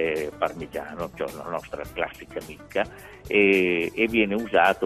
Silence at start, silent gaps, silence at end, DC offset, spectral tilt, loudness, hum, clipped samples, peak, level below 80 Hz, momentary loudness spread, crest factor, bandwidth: 0 s; none; 0 s; under 0.1%; -5.5 dB/octave; -25 LUFS; none; under 0.1%; -6 dBFS; -52 dBFS; 15 LU; 20 dB; 14.5 kHz